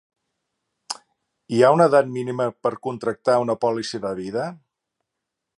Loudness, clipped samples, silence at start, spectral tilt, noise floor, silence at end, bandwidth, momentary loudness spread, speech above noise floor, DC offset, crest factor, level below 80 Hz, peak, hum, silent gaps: -21 LUFS; under 0.1%; 0.9 s; -6 dB/octave; -82 dBFS; 1.05 s; 11.5 kHz; 17 LU; 62 dB; under 0.1%; 20 dB; -66 dBFS; -2 dBFS; none; none